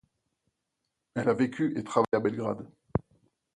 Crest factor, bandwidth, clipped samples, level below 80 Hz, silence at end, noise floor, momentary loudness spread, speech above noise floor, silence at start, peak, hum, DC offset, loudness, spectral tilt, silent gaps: 22 dB; 11 kHz; under 0.1%; -56 dBFS; 0.55 s; -83 dBFS; 8 LU; 55 dB; 1.15 s; -8 dBFS; none; under 0.1%; -30 LUFS; -7.5 dB/octave; none